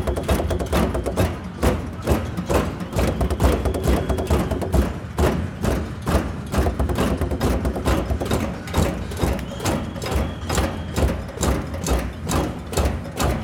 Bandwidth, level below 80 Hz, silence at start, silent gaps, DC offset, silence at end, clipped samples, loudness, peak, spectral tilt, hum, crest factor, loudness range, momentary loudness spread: 17.5 kHz; -26 dBFS; 0 s; none; under 0.1%; 0 s; under 0.1%; -23 LUFS; -4 dBFS; -6 dB/octave; none; 18 dB; 2 LU; 3 LU